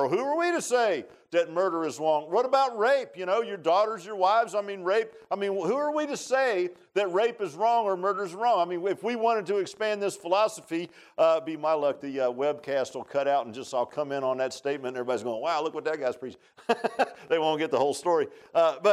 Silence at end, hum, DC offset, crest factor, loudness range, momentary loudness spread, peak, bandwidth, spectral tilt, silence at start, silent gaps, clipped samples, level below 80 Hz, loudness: 0 s; none; under 0.1%; 16 dB; 4 LU; 6 LU; -10 dBFS; 13.5 kHz; -4 dB/octave; 0 s; none; under 0.1%; -82 dBFS; -27 LUFS